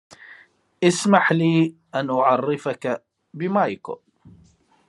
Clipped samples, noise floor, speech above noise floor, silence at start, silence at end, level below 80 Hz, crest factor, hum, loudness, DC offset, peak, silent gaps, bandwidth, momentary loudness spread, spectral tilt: under 0.1%; -57 dBFS; 37 dB; 0.3 s; 0.95 s; -70 dBFS; 22 dB; none; -21 LUFS; under 0.1%; -2 dBFS; none; 11.5 kHz; 14 LU; -5.5 dB/octave